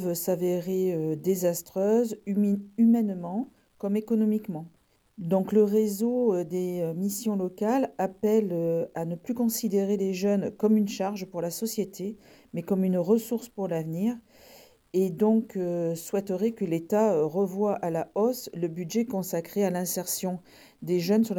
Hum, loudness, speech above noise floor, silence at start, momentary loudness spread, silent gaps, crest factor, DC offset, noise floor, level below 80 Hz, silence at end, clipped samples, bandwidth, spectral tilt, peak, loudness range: none; -27 LUFS; 28 dB; 0 s; 9 LU; none; 16 dB; under 0.1%; -54 dBFS; -70 dBFS; 0 s; under 0.1%; 18.5 kHz; -6.5 dB/octave; -12 dBFS; 3 LU